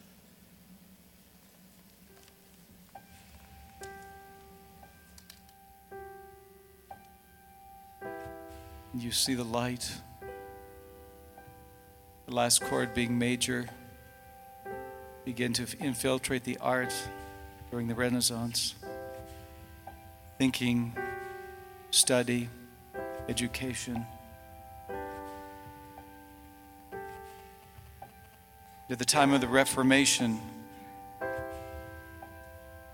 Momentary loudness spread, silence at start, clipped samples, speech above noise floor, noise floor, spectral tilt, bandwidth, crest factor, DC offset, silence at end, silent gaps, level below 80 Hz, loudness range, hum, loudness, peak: 27 LU; 0.5 s; under 0.1%; 29 dB; -59 dBFS; -3 dB/octave; 17.5 kHz; 28 dB; under 0.1%; 0 s; none; -58 dBFS; 23 LU; none; -30 LUFS; -8 dBFS